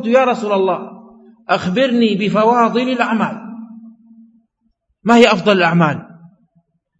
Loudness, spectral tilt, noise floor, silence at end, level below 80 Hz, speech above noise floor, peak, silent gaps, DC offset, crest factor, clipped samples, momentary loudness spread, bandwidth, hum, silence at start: -14 LUFS; -6 dB/octave; -65 dBFS; 0.85 s; -62 dBFS; 52 dB; 0 dBFS; none; under 0.1%; 16 dB; under 0.1%; 20 LU; 8 kHz; none; 0 s